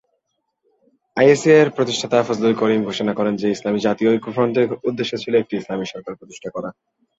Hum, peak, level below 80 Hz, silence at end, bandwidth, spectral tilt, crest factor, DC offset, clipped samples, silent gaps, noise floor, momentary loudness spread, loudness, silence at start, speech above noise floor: none; -2 dBFS; -62 dBFS; 0.5 s; 8 kHz; -5.5 dB/octave; 18 dB; under 0.1%; under 0.1%; none; -73 dBFS; 16 LU; -18 LUFS; 1.15 s; 55 dB